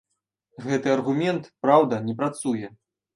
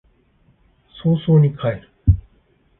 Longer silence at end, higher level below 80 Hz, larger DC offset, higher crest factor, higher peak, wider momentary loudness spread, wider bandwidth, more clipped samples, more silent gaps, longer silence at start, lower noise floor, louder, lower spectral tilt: second, 0.45 s vs 0.6 s; second, -70 dBFS vs -30 dBFS; neither; about the same, 22 dB vs 18 dB; about the same, -4 dBFS vs -2 dBFS; about the same, 11 LU vs 10 LU; first, 11.5 kHz vs 3.9 kHz; neither; neither; second, 0.6 s vs 1.05 s; first, -76 dBFS vs -58 dBFS; second, -24 LUFS vs -19 LUFS; second, -6 dB/octave vs -13.5 dB/octave